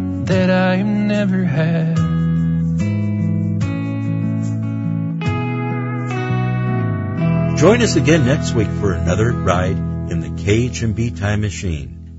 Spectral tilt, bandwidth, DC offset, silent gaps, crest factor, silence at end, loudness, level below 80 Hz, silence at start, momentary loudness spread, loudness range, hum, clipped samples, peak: -6.5 dB/octave; 8 kHz; under 0.1%; none; 16 dB; 0 s; -18 LUFS; -40 dBFS; 0 s; 8 LU; 5 LU; none; under 0.1%; 0 dBFS